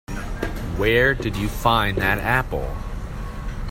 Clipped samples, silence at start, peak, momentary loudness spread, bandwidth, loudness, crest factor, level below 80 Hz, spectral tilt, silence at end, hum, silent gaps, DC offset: under 0.1%; 0.1 s; -2 dBFS; 15 LU; 16.5 kHz; -21 LUFS; 20 dB; -30 dBFS; -5.5 dB/octave; 0 s; none; none; under 0.1%